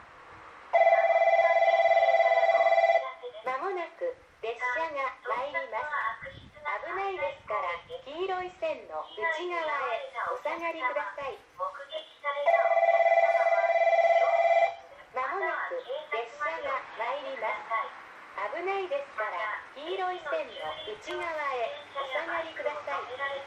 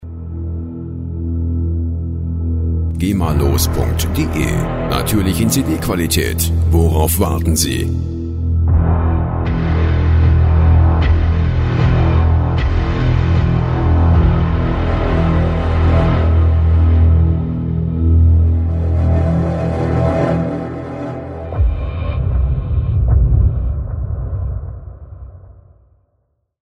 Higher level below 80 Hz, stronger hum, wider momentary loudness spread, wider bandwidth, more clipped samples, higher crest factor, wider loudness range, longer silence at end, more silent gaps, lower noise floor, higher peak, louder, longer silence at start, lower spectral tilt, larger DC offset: second, -70 dBFS vs -20 dBFS; neither; first, 15 LU vs 11 LU; second, 8.2 kHz vs 16 kHz; neither; about the same, 16 dB vs 14 dB; first, 9 LU vs 5 LU; second, 0 s vs 1.1 s; neither; second, -50 dBFS vs -65 dBFS; second, -12 dBFS vs 0 dBFS; second, -28 LUFS vs -16 LUFS; about the same, 0 s vs 0 s; second, -3.5 dB/octave vs -6.5 dB/octave; neither